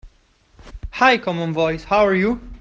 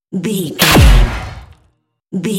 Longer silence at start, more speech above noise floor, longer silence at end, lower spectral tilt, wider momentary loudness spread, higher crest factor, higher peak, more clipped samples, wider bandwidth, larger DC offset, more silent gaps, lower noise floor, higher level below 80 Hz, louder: about the same, 0.05 s vs 0.1 s; second, 39 dB vs 49 dB; about the same, 0.05 s vs 0 s; first, -6 dB/octave vs -4.5 dB/octave; second, 11 LU vs 18 LU; first, 18 dB vs 12 dB; about the same, -2 dBFS vs 0 dBFS; second, under 0.1% vs 0.2%; second, 7.6 kHz vs 17.5 kHz; neither; neither; about the same, -56 dBFS vs -59 dBFS; second, -40 dBFS vs -16 dBFS; second, -18 LUFS vs -12 LUFS